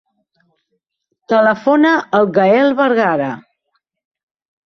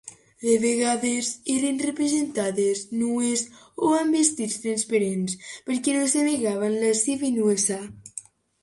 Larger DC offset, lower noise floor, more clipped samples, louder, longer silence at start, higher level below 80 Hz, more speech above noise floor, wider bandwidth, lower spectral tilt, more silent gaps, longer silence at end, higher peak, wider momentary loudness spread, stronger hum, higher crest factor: neither; first, -69 dBFS vs -44 dBFS; neither; first, -13 LUFS vs -24 LUFS; first, 1.3 s vs 0.05 s; about the same, -62 dBFS vs -66 dBFS; first, 56 dB vs 20 dB; second, 6.4 kHz vs 11.5 kHz; first, -7 dB/octave vs -3.5 dB/octave; neither; first, 1.25 s vs 0.45 s; first, 0 dBFS vs -6 dBFS; about the same, 7 LU vs 9 LU; neither; about the same, 16 dB vs 18 dB